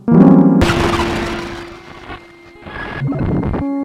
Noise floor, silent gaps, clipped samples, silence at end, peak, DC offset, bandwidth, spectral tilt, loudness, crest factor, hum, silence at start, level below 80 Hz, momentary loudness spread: -39 dBFS; none; 0.3%; 0 s; 0 dBFS; under 0.1%; 13 kHz; -7 dB/octave; -14 LUFS; 14 dB; none; 0.05 s; -30 dBFS; 24 LU